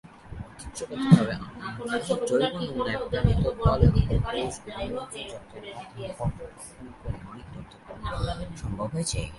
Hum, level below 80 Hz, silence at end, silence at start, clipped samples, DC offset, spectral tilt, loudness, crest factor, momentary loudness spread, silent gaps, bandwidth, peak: none; -36 dBFS; 0 s; 0.05 s; under 0.1%; under 0.1%; -6.5 dB/octave; -27 LUFS; 24 dB; 21 LU; none; 11.5 kHz; -2 dBFS